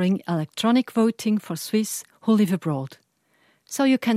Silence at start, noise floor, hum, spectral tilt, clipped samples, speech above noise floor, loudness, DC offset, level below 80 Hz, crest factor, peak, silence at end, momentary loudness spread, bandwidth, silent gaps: 0 s; -64 dBFS; none; -5.5 dB/octave; under 0.1%; 42 dB; -23 LUFS; under 0.1%; -74 dBFS; 14 dB; -8 dBFS; 0 s; 9 LU; 15.5 kHz; none